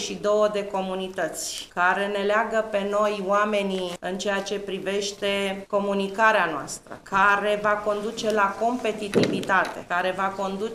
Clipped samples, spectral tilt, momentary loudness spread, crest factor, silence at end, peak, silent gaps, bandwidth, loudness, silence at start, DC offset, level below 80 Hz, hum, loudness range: under 0.1%; -4 dB/octave; 9 LU; 20 dB; 0 s; -4 dBFS; none; 15.5 kHz; -24 LUFS; 0 s; under 0.1%; -58 dBFS; none; 2 LU